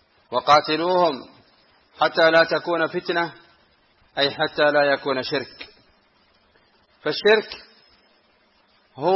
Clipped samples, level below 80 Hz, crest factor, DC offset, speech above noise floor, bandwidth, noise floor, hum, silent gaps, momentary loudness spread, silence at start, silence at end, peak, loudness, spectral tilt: under 0.1%; -64 dBFS; 18 dB; under 0.1%; 41 dB; 7.2 kHz; -61 dBFS; none; none; 17 LU; 0.3 s; 0 s; -4 dBFS; -20 LUFS; -5 dB/octave